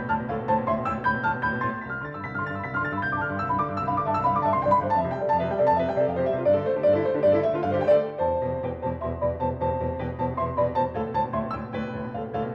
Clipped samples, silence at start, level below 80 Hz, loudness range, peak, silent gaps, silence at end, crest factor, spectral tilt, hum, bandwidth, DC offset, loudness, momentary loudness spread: under 0.1%; 0 s; -48 dBFS; 5 LU; -10 dBFS; none; 0 s; 16 dB; -9 dB/octave; none; 6.6 kHz; under 0.1%; -25 LUFS; 9 LU